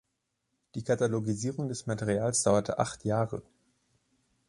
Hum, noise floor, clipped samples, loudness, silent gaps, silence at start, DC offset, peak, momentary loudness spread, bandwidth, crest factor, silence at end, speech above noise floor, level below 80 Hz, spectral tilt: none; -81 dBFS; under 0.1%; -30 LUFS; none; 0.75 s; under 0.1%; -10 dBFS; 9 LU; 11.5 kHz; 22 dB; 1.05 s; 51 dB; -60 dBFS; -5 dB/octave